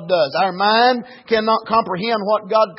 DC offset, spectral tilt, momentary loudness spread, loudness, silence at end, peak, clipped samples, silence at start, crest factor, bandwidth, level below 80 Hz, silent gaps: under 0.1%; -8.5 dB/octave; 6 LU; -17 LUFS; 0 s; -2 dBFS; under 0.1%; 0 s; 14 dB; 5.8 kHz; -58 dBFS; none